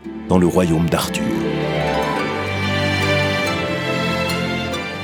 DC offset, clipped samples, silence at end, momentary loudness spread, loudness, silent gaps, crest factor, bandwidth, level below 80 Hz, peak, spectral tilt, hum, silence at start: under 0.1%; under 0.1%; 0 s; 5 LU; -19 LUFS; none; 18 dB; 19 kHz; -42 dBFS; 0 dBFS; -5.5 dB/octave; none; 0 s